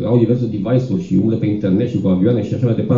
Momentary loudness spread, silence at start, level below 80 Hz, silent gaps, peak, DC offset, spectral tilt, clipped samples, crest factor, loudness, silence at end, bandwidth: 3 LU; 0 s; -48 dBFS; none; -2 dBFS; under 0.1%; -10 dB/octave; under 0.1%; 14 dB; -17 LUFS; 0 s; 7.2 kHz